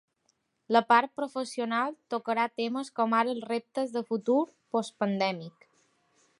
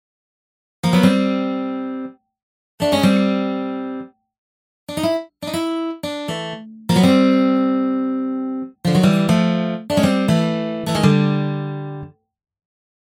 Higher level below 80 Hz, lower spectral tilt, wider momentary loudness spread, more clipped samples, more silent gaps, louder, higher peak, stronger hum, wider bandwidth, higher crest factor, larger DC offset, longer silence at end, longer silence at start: second, -84 dBFS vs -54 dBFS; second, -5 dB/octave vs -6.5 dB/octave; second, 9 LU vs 13 LU; neither; second, none vs 2.43-2.78 s, 4.38-4.87 s; second, -29 LUFS vs -19 LUFS; second, -8 dBFS vs -2 dBFS; neither; second, 11.5 kHz vs 16.5 kHz; about the same, 22 dB vs 18 dB; neither; about the same, 0.9 s vs 0.95 s; second, 0.7 s vs 0.85 s